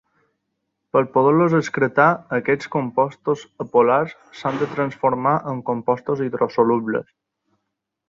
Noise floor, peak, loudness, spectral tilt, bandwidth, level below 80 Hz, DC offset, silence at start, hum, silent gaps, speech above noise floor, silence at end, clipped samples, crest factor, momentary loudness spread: -79 dBFS; -2 dBFS; -20 LUFS; -7.5 dB/octave; 7.4 kHz; -62 dBFS; under 0.1%; 0.95 s; none; none; 59 dB; 1.05 s; under 0.1%; 18 dB; 9 LU